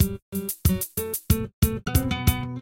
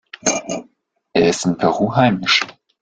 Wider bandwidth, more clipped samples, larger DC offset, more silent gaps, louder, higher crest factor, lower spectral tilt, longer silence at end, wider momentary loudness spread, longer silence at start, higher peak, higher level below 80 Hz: first, 17 kHz vs 9.6 kHz; neither; neither; first, 0.22-0.32 s, 1.53-1.62 s vs none; second, -25 LUFS vs -17 LUFS; about the same, 20 dB vs 18 dB; about the same, -5 dB/octave vs -4 dB/octave; second, 0 s vs 0.3 s; second, 6 LU vs 12 LU; second, 0 s vs 0.25 s; second, -6 dBFS vs 0 dBFS; first, -32 dBFS vs -52 dBFS